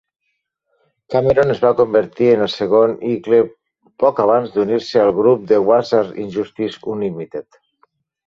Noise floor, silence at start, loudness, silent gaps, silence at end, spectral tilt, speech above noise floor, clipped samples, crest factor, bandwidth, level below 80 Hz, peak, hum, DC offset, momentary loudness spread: -73 dBFS; 1.1 s; -16 LUFS; none; 0.85 s; -7 dB/octave; 57 dB; under 0.1%; 16 dB; 7.2 kHz; -54 dBFS; -2 dBFS; none; under 0.1%; 10 LU